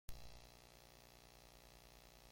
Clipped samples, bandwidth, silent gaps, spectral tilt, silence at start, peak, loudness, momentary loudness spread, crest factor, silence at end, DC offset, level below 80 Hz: under 0.1%; 16.5 kHz; none; -3 dB/octave; 0.1 s; -30 dBFS; -63 LUFS; 3 LU; 28 dB; 0 s; under 0.1%; -64 dBFS